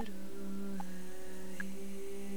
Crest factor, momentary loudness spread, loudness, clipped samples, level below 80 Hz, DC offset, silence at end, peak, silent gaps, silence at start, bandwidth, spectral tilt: 16 dB; 5 LU; -45 LUFS; under 0.1%; -62 dBFS; 2%; 0 s; -26 dBFS; none; 0 s; over 20 kHz; -5.5 dB/octave